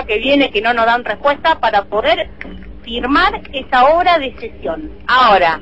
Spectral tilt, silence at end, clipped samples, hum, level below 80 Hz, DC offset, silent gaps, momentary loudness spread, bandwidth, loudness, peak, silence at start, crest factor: -5.5 dB/octave; 0 s; under 0.1%; none; -36 dBFS; 1%; none; 15 LU; 8.2 kHz; -14 LUFS; 0 dBFS; 0 s; 14 dB